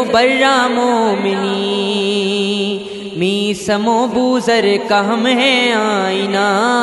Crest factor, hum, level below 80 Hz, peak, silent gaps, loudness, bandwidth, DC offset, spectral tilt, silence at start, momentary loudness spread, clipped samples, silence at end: 14 dB; none; -54 dBFS; 0 dBFS; none; -14 LUFS; 11.5 kHz; under 0.1%; -4 dB/octave; 0 s; 6 LU; under 0.1%; 0 s